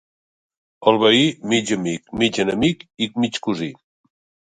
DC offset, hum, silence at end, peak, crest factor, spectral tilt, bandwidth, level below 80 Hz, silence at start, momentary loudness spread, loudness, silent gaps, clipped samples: under 0.1%; none; 0.8 s; 0 dBFS; 20 dB; -4.5 dB/octave; 9.6 kHz; -54 dBFS; 0.8 s; 11 LU; -19 LUFS; none; under 0.1%